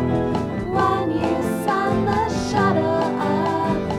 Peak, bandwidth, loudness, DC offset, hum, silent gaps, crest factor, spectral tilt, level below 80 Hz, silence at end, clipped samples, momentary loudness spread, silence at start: -6 dBFS; 15.5 kHz; -21 LUFS; 0.1%; none; none; 14 dB; -6.5 dB/octave; -42 dBFS; 0 s; under 0.1%; 3 LU; 0 s